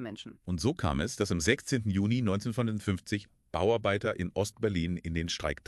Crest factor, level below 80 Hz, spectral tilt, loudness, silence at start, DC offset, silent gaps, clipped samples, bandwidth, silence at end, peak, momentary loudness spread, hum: 20 dB; -48 dBFS; -5.5 dB/octave; -31 LUFS; 0 s; under 0.1%; none; under 0.1%; 13 kHz; 0.15 s; -10 dBFS; 8 LU; none